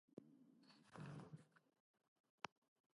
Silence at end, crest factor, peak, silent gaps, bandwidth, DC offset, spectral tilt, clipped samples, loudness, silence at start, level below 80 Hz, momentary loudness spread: 0.5 s; 34 dB; -30 dBFS; 0.13-0.17 s, 1.80-1.94 s, 2.08-2.24 s, 2.30-2.38 s; 11 kHz; under 0.1%; -5.5 dB/octave; under 0.1%; -60 LUFS; 0.1 s; under -90 dBFS; 8 LU